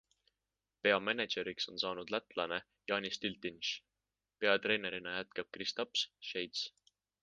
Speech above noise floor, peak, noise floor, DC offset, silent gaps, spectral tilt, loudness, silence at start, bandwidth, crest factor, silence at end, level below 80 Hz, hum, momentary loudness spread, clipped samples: over 52 dB; -14 dBFS; under -90 dBFS; under 0.1%; none; -3 dB/octave; -37 LUFS; 0.85 s; 9.8 kHz; 26 dB; 0.55 s; -76 dBFS; none; 9 LU; under 0.1%